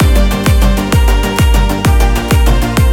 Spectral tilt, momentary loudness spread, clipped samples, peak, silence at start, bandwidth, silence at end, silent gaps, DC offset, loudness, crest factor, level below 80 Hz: -5.5 dB/octave; 1 LU; under 0.1%; 0 dBFS; 0 s; 17 kHz; 0 s; none; under 0.1%; -11 LUFS; 8 dB; -10 dBFS